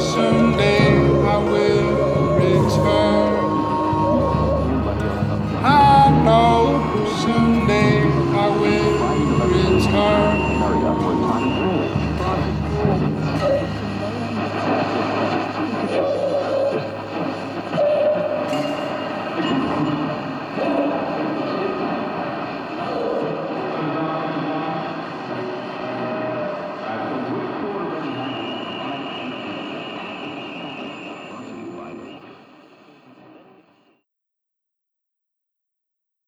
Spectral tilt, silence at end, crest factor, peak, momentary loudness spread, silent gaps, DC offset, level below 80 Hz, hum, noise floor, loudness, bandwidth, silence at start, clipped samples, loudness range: -7 dB/octave; 3.9 s; 18 dB; -2 dBFS; 13 LU; none; under 0.1%; -36 dBFS; none; -81 dBFS; -20 LUFS; 12.5 kHz; 0 s; under 0.1%; 13 LU